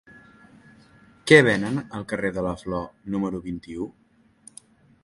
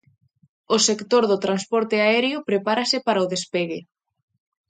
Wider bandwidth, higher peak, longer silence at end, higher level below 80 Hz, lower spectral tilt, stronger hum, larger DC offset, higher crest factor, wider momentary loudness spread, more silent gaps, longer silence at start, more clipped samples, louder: first, 11.5 kHz vs 9.6 kHz; first, 0 dBFS vs -4 dBFS; first, 1.15 s vs 0.85 s; first, -52 dBFS vs -72 dBFS; first, -5.5 dB/octave vs -3 dB/octave; neither; neither; first, 26 dB vs 18 dB; first, 19 LU vs 7 LU; neither; first, 1.25 s vs 0.7 s; neither; about the same, -23 LUFS vs -21 LUFS